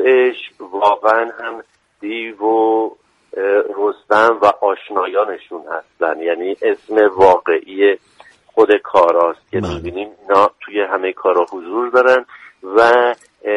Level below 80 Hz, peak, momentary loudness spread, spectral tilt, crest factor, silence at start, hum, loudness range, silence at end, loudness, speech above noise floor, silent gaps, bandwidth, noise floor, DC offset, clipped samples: -50 dBFS; 0 dBFS; 15 LU; -5.5 dB/octave; 16 dB; 0 s; none; 3 LU; 0 s; -15 LUFS; 20 dB; none; 10 kHz; -35 dBFS; under 0.1%; under 0.1%